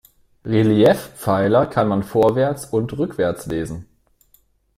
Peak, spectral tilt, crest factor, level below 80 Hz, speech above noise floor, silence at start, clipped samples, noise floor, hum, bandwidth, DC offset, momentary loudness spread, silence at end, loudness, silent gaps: -2 dBFS; -7 dB/octave; 16 dB; -48 dBFS; 41 dB; 0.45 s; under 0.1%; -59 dBFS; none; 16 kHz; under 0.1%; 11 LU; 0.95 s; -19 LUFS; none